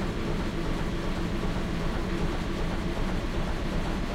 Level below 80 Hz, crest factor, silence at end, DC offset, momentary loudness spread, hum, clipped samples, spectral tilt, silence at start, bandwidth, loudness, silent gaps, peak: -32 dBFS; 12 dB; 0 s; under 0.1%; 1 LU; none; under 0.1%; -6 dB/octave; 0 s; 14.5 kHz; -31 LUFS; none; -16 dBFS